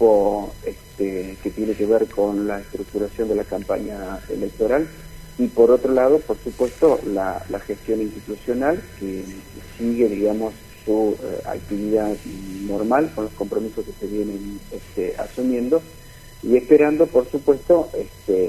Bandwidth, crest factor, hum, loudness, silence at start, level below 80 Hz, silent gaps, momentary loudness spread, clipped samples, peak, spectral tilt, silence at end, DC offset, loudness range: 16 kHz; 20 dB; none; -21 LUFS; 0 s; -44 dBFS; none; 14 LU; under 0.1%; 0 dBFS; -6.5 dB/octave; 0 s; under 0.1%; 5 LU